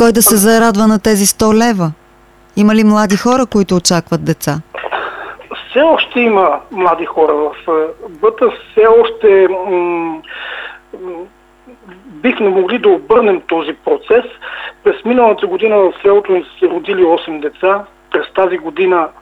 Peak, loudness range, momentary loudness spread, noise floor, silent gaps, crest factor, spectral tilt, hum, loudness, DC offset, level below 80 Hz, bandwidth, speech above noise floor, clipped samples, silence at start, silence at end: 0 dBFS; 3 LU; 14 LU; -45 dBFS; none; 12 dB; -4.5 dB/octave; none; -12 LUFS; under 0.1%; -44 dBFS; 16.5 kHz; 33 dB; under 0.1%; 0 s; 0.1 s